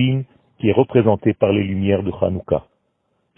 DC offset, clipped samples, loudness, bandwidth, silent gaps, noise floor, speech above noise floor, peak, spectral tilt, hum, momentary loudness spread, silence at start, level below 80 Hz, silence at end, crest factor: under 0.1%; under 0.1%; -19 LUFS; 3.6 kHz; none; -68 dBFS; 51 dB; -2 dBFS; -12 dB/octave; none; 8 LU; 0 s; -48 dBFS; 0.75 s; 18 dB